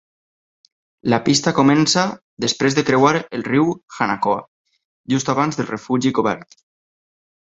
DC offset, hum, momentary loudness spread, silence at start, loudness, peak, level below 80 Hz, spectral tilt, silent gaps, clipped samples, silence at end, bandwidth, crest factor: under 0.1%; none; 9 LU; 1.05 s; -18 LUFS; -2 dBFS; -58 dBFS; -4.5 dB/octave; 2.22-2.37 s, 3.83-3.88 s, 4.48-4.65 s, 4.85-5.04 s; under 0.1%; 1.15 s; 8.2 kHz; 18 dB